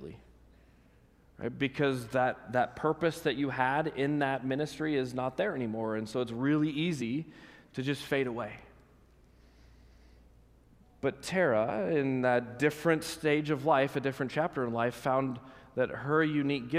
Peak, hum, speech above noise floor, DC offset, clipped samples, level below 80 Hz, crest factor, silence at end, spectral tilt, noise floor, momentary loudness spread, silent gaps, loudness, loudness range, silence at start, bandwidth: -12 dBFS; none; 31 dB; under 0.1%; under 0.1%; -64 dBFS; 20 dB; 0 s; -6 dB/octave; -62 dBFS; 8 LU; none; -31 LUFS; 8 LU; 0 s; 15.5 kHz